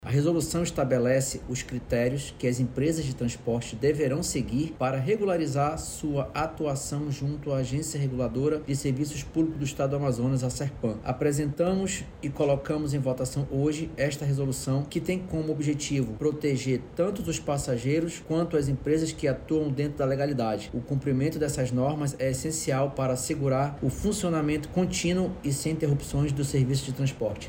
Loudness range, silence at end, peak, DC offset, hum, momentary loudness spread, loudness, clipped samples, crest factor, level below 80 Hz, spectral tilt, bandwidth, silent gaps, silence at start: 1 LU; 0 s; -12 dBFS; under 0.1%; none; 4 LU; -28 LUFS; under 0.1%; 14 dB; -46 dBFS; -6 dB/octave; 16.5 kHz; none; 0 s